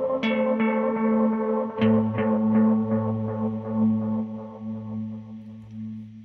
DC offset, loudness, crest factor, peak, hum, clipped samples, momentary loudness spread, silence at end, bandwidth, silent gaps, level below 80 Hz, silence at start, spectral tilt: under 0.1%; -24 LUFS; 16 dB; -8 dBFS; none; under 0.1%; 16 LU; 0 s; 4.2 kHz; none; -60 dBFS; 0 s; -9.5 dB/octave